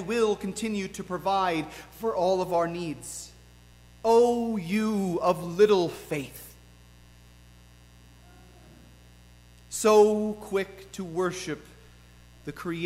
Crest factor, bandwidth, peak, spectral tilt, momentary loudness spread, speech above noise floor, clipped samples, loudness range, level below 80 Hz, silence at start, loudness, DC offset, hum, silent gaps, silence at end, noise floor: 20 dB; 16 kHz; -8 dBFS; -5 dB/octave; 18 LU; 27 dB; under 0.1%; 4 LU; -56 dBFS; 0 s; -26 LUFS; under 0.1%; 60 Hz at -50 dBFS; none; 0 s; -53 dBFS